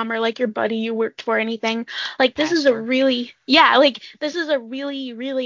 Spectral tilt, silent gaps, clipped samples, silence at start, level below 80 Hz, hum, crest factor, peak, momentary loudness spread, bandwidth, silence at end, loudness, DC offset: -3.5 dB/octave; none; under 0.1%; 0 s; -66 dBFS; none; 18 dB; -2 dBFS; 13 LU; 7.6 kHz; 0 s; -19 LUFS; under 0.1%